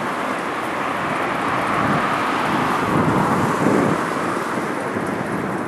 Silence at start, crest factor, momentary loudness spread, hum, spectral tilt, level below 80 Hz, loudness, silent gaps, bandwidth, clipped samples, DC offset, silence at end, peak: 0 s; 18 dB; 6 LU; none; -5.5 dB/octave; -50 dBFS; -20 LUFS; none; 13.5 kHz; under 0.1%; under 0.1%; 0 s; -4 dBFS